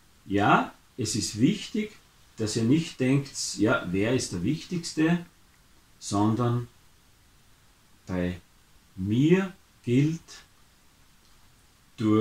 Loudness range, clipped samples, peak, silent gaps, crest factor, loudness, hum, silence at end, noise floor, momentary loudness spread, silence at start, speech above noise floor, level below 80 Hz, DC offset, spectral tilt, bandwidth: 5 LU; under 0.1%; -6 dBFS; none; 22 dB; -27 LUFS; none; 0 s; -59 dBFS; 14 LU; 0.25 s; 33 dB; -58 dBFS; under 0.1%; -5.5 dB/octave; 15.5 kHz